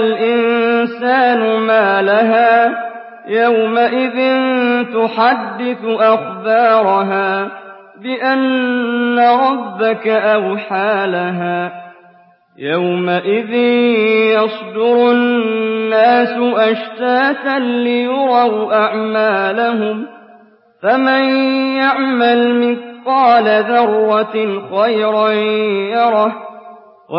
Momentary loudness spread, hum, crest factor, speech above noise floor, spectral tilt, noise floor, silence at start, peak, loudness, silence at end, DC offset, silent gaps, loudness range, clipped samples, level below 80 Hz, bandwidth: 8 LU; none; 12 dB; 34 dB; -10.5 dB/octave; -48 dBFS; 0 s; -2 dBFS; -14 LUFS; 0 s; under 0.1%; none; 3 LU; under 0.1%; -68 dBFS; 5.6 kHz